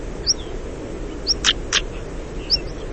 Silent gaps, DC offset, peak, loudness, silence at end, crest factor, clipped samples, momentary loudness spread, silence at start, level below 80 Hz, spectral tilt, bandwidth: none; 0.6%; -2 dBFS; -21 LUFS; 0 s; 22 dB; under 0.1%; 14 LU; 0 s; -32 dBFS; -2 dB/octave; 8.8 kHz